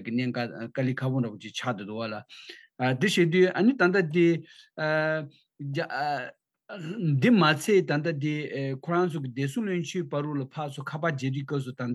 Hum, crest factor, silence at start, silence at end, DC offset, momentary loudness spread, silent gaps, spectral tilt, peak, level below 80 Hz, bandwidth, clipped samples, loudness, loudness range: none; 20 dB; 0 s; 0 s; under 0.1%; 14 LU; none; -6.5 dB/octave; -8 dBFS; under -90 dBFS; 12.5 kHz; under 0.1%; -27 LUFS; 5 LU